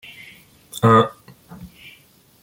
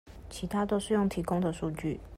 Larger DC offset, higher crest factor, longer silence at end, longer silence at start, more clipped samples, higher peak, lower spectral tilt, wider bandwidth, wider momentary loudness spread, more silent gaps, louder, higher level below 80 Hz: neither; first, 22 dB vs 14 dB; first, 0.75 s vs 0 s; first, 0.75 s vs 0.05 s; neither; first, -2 dBFS vs -16 dBFS; about the same, -6.5 dB/octave vs -6.5 dB/octave; about the same, 17 kHz vs 15.5 kHz; first, 27 LU vs 9 LU; neither; first, -17 LUFS vs -31 LUFS; second, -56 dBFS vs -50 dBFS